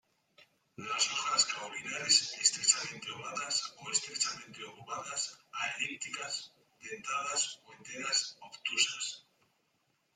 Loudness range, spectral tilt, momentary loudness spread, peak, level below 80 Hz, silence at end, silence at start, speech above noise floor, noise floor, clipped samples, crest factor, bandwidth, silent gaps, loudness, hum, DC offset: 7 LU; 1 dB/octave; 18 LU; -10 dBFS; -84 dBFS; 0.95 s; 0.4 s; 41 dB; -77 dBFS; under 0.1%; 26 dB; 14.5 kHz; none; -32 LUFS; none; under 0.1%